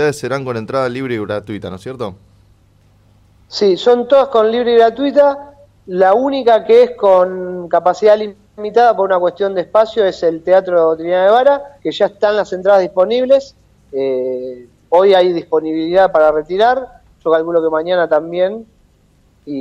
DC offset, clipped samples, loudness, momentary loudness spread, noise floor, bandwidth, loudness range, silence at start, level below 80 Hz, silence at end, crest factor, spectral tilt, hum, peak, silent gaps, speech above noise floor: under 0.1%; under 0.1%; -13 LUFS; 14 LU; -52 dBFS; 10.5 kHz; 4 LU; 0 s; -52 dBFS; 0 s; 12 dB; -6 dB/octave; none; -2 dBFS; none; 39 dB